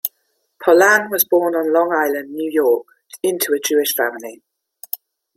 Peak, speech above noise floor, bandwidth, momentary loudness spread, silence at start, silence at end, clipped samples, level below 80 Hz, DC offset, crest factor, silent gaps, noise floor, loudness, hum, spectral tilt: 0 dBFS; 51 dB; 16.5 kHz; 16 LU; 0.05 s; 0.4 s; under 0.1%; -70 dBFS; under 0.1%; 18 dB; none; -68 dBFS; -17 LUFS; none; -2 dB/octave